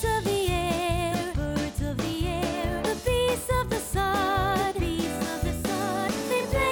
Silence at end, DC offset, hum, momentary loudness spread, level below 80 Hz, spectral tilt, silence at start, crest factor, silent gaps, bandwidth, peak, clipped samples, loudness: 0 s; under 0.1%; none; 4 LU; -36 dBFS; -5 dB/octave; 0 s; 12 dB; none; 19.5 kHz; -14 dBFS; under 0.1%; -27 LUFS